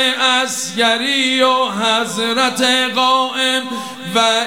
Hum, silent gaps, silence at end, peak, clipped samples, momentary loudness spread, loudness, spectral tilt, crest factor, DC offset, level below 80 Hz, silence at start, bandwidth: none; none; 0 s; -2 dBFS; under 0.1%; 6 LU; -14 LUFS; -1.5 dB/octave; 14 dB; 0.3%; -70 dBFS; 0 s; 17 kHz